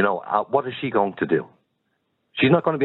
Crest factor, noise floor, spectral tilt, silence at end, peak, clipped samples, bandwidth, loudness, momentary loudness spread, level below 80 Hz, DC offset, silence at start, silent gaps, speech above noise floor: 18 dB; -72 dBFS; -10 dB/octave; 0 s; -4 dBFS; under 0.1%; 4.2 kHz; -22 LUFS; 6 LU; -64 dBFS; under 0.1%; 0 s; none; 51 dB